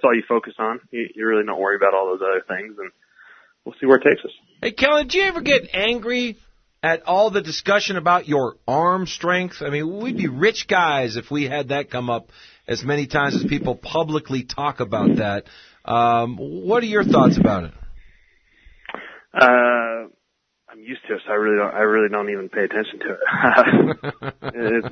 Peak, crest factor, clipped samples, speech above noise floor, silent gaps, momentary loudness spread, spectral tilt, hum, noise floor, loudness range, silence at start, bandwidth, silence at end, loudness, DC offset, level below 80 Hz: 0 dBFS; 20 dB; under 0.1%; 53 dB; none; 13 LU; -5.5 dB/octave; none; -73 dBFS; 4 LU; 0.05 s; 6.6 kHz; 0 s; -20 LUFS; under 0.1%; -50 dBFS